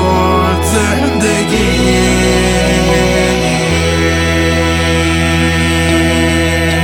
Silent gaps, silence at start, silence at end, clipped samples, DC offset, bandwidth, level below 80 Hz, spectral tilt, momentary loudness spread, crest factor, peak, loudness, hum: none; 0 s; 0 s; under 0.1%; under 0.1%; 17.5 kHz; -22 dBFS; -4.5 dB/octave; 2 LU; 10 dB; 0 dBFS; -11 LUFS; none